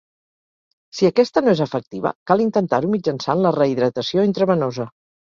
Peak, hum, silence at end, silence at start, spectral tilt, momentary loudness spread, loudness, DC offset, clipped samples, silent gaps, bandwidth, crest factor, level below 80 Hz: -2 dBFS; none; 0.5 s; 0.95 s; -6.5 dB/octave; 9 LU; -19 LUFS; under 0.1%; under 0.1%; 1.87-1.91 s, 2.15-2.26 s; 7.4 kHz; 18 dB; -60 dBFS